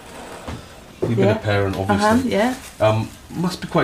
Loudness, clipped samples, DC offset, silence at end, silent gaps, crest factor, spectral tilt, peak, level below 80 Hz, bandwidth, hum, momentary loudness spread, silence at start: -20 LUFS; under 0.1%; under 0.1%; 0 s; none; 16 dB; -6 dB/octave; -4 dBFS; -46 dBFS; 15.5 kHz; none; 17 LU; 0 s